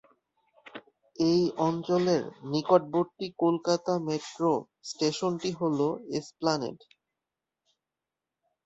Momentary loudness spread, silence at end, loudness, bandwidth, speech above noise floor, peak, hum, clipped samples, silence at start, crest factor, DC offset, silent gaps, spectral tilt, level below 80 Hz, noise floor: 11 LU; 1.9 s; -28 LUFS; 8 kHz; 61 dB; -8 dBFS; none; under 0.1%; 0.75 s; 22 dB; under 0.1%; none; -6 dB/octave; -70 dBFS; -89 dBFS